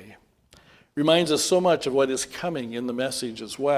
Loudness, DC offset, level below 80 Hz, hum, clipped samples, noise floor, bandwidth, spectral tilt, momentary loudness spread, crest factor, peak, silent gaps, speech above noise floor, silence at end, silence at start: -24 LUFS; under 0.1%; -62 dBFS; none; under 0.1%; -57 dBFS; 16 kHz; -4 dB/octave; 10 LU; 18 dB; -6 dBFS; none; 33 dB; 0 s; 0 s